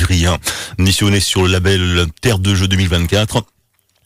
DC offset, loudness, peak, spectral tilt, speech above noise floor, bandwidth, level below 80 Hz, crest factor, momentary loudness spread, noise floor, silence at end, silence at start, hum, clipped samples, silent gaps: under 0.1%; -14 LUFS; -4 dBFS; -4.5 dB/octave; 47 dB; 16 kHz; -34 dBFS; 10 dB; 5 LU; -61 dBFS; 0.6 s; 0 s; none; under 0.1%; none